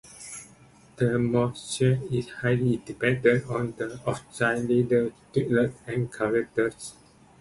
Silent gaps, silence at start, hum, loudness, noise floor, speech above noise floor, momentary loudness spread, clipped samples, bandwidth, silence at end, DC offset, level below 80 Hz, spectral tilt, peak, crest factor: none; 0.05 s; none; -26 LUFS; -54 dBFS; 29 dB; 9 LU; under 0.1%; 11.5 kHz; 0.5 s; under 0.1%; -56 dBFS; -6.5 dB/octave; -6 dBFS; 20 dB